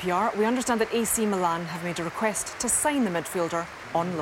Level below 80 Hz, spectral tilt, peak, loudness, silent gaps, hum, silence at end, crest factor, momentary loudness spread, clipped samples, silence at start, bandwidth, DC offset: -56 dBFS; -3.5 dB/octave; -10 dBFS; -26 LUFS; none; none; 0 s; 16 dB; 7 LU; under 0.1%; 0 s; 17 kHz; under 0.1%